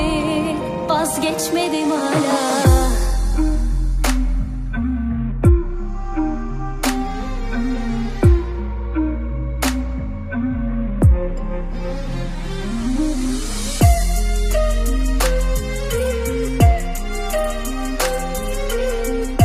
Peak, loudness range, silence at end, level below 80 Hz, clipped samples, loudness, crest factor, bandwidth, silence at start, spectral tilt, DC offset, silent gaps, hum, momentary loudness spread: 0 dBFS; 3 LU; 0 s; -20 dBFS; under 0.1%; -20 LUFS; 18 dB; 15.5 kHz; 0 s; -5.5 dB/octave; under 0.1%; none; none; 10 LU